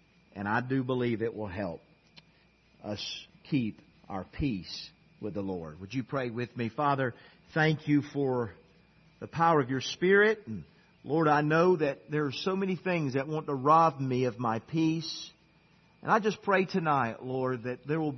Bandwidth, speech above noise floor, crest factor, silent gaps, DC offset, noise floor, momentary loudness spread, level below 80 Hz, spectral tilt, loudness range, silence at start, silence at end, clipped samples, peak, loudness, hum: 6.4 kHz; 35 dB; 20 dB; none; under 0.1%; -64 dBFS; 16 LU; -60 dBFS; -6.5 dB/octave; 9 LU; 0.35 s; 0 s; under 0.1%; -10 dBFS; -30 LUFS; none